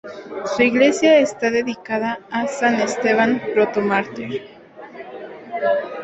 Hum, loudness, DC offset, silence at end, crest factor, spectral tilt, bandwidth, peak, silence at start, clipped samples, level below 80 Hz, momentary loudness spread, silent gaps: none; -19 LUFS; under 0.1%; 0 s; 18 dB; -4.5 dB/octave; 8.2 kHz; -2 dBFS; 0.05 s; under 0.1%; -62 dBFS; 19 LU; none